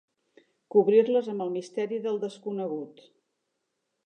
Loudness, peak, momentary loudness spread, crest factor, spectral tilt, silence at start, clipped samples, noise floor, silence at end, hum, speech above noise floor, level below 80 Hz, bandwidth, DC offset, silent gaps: -27 LUFS; -10 dBFS; 13 LU; 20 dB; -7 dB/octave; 0.75 s; under 0.1%; -80 dBFS; 1.15 s; none; 54 dB; -88 dBFS; 9 kHz; under 0.1%; none